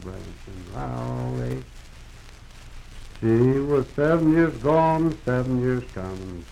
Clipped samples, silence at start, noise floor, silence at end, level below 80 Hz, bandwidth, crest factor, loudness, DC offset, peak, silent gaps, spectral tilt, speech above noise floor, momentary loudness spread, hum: under 0.1%; 0 s; -43 dBFS; 0 s; -42 dBFS; 12 kHz; 16 dB; -23 LUFS; under 0.1%; -8 dBFS; none; -8.5 dB/octave; 20 dB; 18 LU; none